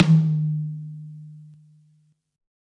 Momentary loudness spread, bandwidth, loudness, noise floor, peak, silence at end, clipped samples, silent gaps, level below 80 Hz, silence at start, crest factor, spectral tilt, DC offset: 25 LU; 6.6 kHz; -23 LUFS; -62 dBFS; -2 dBFS; 1.2 s; under 0.1%; none; -64 dBFS; 0 s; 22 dB; -9 dB/octave; under 0.1%